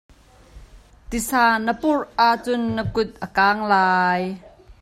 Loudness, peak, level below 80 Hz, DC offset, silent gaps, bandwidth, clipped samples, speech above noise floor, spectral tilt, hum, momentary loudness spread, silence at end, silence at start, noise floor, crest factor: -20 LUFS; -4 dBFS; -46 dBFS; under 0.1%; none; 16 kHz; under 0.1%; 27 dB; -4.5 dB/octave; none; 9 LU; 0.1 s; 0.55 s; -47 dBFS; 18 dB